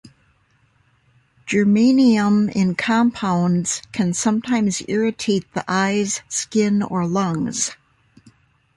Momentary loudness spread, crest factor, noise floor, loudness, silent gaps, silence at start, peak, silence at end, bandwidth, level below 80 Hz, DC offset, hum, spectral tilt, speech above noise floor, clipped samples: 8 LU; 14 dB; -60 dBFS; -19 LUFS; none; 1.45 s; -4 dBFS; 1 s; 11.5 kHz; -58 dBFS; under 0.1%; none; -5 dB/octave; 42 dB; under 0.1%